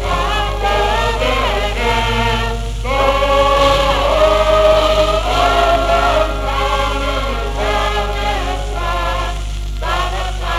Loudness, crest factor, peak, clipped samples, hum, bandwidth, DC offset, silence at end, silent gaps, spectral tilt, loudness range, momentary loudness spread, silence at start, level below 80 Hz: -15 LUFS; 12 dB; -4 dBFS; under 0.1%; 50 Hz at -20 dBFS; 14.5 kHz; under 0.1%; 0 s; none; -4.5 dB/octave; 6 LU; 9 LU; 0 s; -20 dBFS